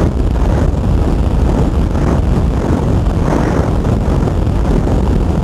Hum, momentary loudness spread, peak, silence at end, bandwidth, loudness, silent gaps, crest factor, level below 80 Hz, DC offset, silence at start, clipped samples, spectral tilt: none; 1 LU; 0 dBFS; 0 s; 12 kHz; -14 LUFS; none; 12 dB; -16 dBFS; under 0.1%; 0 s; under 0.1%; -8 dB/octave